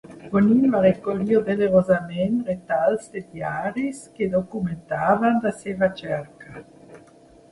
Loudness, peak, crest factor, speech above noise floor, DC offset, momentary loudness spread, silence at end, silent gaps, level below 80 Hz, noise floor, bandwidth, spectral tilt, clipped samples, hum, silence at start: -22 LUFS; -6 dBFS; 18 dB; 29 dB; under 0.1%; 12 LU; 0.55 s; none; -56 dBFS; -51 dBFS; 11.5 kHz; -7.5 dB/octave; under 0.1%; none; 0.1 s